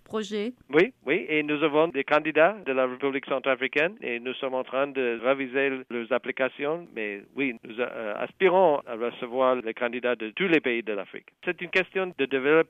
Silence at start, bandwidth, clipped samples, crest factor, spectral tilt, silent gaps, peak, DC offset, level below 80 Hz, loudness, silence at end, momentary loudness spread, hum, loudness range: 0.1 s; 8.4 kHz; under 0.1%; 18 dB; -6 dB/octave; none; -8 dBFS; under 0.1%; -74 dBFS; -26 LUFS; 0.05 s; 10 LU; none; 4 LU